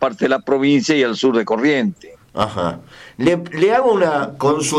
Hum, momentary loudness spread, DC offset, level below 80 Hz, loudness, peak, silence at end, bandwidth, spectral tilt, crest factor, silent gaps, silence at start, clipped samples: none; 9 LU; under 0.1%; -54 dBFS; -17 LUFS; -6 dBFS; 0 s; 13.5 kHz; -5 dB/octave; 12 dB; none; 0 s; under 0.1%